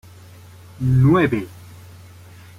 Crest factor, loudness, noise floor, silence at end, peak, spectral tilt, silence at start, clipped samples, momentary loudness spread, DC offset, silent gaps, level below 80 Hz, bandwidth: 16 dB; -18 LUFS; -43 dBFS; 0.85 s; -6 dBFS; -8.5 dB/octave; 0.8 s; under 0.1%; 13 LU; under 0.1%; none; -44 dBFS; 12 kHz